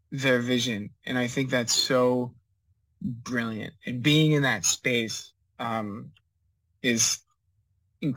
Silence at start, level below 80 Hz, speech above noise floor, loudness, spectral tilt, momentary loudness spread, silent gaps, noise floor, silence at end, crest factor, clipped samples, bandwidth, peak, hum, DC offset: 0.1 s; -66 dBFS; 46 dB; -26 LUFS; -3.5 dB/octave; 14 LU; none; -72 dBFS; 0 s; 18 dB; under 0.1%; 17 kHz; -10 dBFS; none; under 0.1%